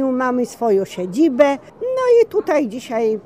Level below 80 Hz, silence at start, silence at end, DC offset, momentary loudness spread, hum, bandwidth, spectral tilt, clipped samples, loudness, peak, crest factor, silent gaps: -62 dBFS; 0 s; 0.05 s; 0.1%; 9 LU; none; 15.5 kHz; -5.5 dB/octave; under 0.1%; -18 LUFS; 0 dBFS; 16 dB; none